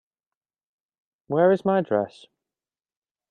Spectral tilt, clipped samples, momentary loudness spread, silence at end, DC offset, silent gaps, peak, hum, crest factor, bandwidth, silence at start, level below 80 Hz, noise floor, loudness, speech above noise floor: -8.5 dB/octave; under 0.1%; 9 LU; 1.2 s; under 0.1%; none; -8 dBFS; none; 20 dB; 9 kHz; 1.3 s; -72 dBFS; under -90 dBFS; -22 LUFS; over 68 dB